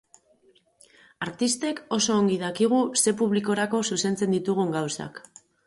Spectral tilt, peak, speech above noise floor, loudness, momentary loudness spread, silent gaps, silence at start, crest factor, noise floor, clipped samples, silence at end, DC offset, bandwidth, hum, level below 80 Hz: -4 dB/octave; -8 dBFS; 37 dB; -25 LUFS; 12 LU; none; 1.2 s; 18 dB; -62 dBFS; under 0.1%; 0.45 s; under 0.1%; 12 kHz; none; -68 dBFS